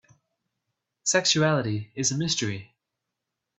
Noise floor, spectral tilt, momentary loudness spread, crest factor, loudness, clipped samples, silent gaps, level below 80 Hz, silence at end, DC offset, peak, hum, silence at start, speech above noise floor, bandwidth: -84 dBFS; -3 dB/octave; 10 LU; 22 dB; -24 LUFS; under 0.1%; none; -64 dBFS; 0.95 s; under 0.1%; -6 dBFS; none; 1.05 s; 59 dB; 8.4 kHz